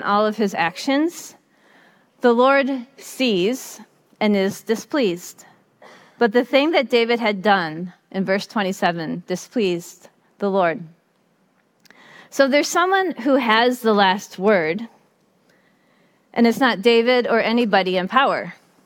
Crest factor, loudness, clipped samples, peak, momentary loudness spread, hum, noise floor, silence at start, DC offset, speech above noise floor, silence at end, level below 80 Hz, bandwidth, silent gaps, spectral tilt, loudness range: 20 dB; -19 LUFS; under 0.1%; -2 dBFS; 13 LU; none; -62 dBFS; 0 s; under 0.1%; 43 dB; 0.3 s; -70 dBFS; 17.5 kHz; none; -4.5 dB/octave; 5 LU